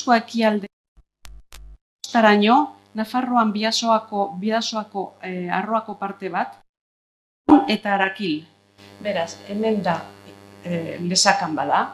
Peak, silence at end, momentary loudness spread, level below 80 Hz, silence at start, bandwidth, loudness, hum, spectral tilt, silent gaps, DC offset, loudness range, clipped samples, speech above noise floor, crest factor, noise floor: 0 dBFS; 0 s; 14 LU; -56 dBFS; 0 s; 13 kHz; -21 LUFS; none; -4 dB/octave; 0.73-0.96 s, 1.81-1.99 s, 6.69-6.74 s, 6.81-7.45 s; under 0.1%; 6 LU; under 0.1%; 23 dB; 22 dB; -43 dBFS